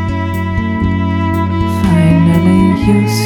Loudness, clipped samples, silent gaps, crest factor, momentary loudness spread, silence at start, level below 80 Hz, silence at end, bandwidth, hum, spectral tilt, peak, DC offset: -12 LUFS; under 0.1%; none; 10 dB; 7 LU; 0 s; -28 dBFS; 0 s; 16.5 kHz; none; -7 dB/octave; 0 dBFS; under 0.1%